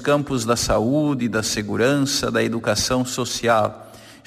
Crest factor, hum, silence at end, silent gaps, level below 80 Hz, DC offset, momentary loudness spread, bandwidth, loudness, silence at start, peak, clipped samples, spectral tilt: 14 dB; none; 0.1 s; none; -44 dBFS; under 0.1%; 4 LU; 15.5 kHz; -20 LUFS; 0 s; -6 dBFS; under 0.1%; -4 dB/octave